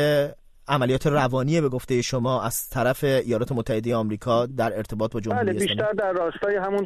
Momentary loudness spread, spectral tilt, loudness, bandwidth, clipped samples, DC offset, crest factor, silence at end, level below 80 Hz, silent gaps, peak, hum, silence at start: 5 LU; -5.5 dB/octave; -24 LUFS; 13.5 kHz; under 0.1%; under 0.1%; 16 dB; 0 s; -48 dBFS; none; -8 dBFS; none; 0 s